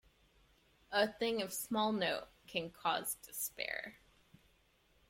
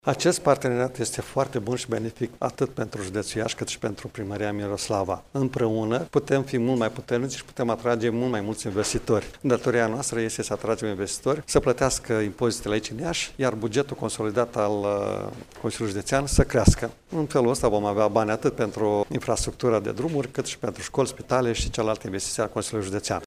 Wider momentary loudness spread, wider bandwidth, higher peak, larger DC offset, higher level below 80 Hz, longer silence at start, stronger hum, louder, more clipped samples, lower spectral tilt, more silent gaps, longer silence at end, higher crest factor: about the same, 8 LU vs 7 LU; about the same, 16.5 kHz vs 15.5 kHz; second, -20 dBFS vs -4 dBFS; neither; second, -72 dBFS vs -40 dBFS; first, 0.9 s vs 0.05 s; neither; second, -38 LUFS vs -26 LUFS; neither; second, -2.5 dB/octave vs -5 dB/octave; neither; first, 1.15 s vs 0 s; about the same, 20 dB vs 22 dB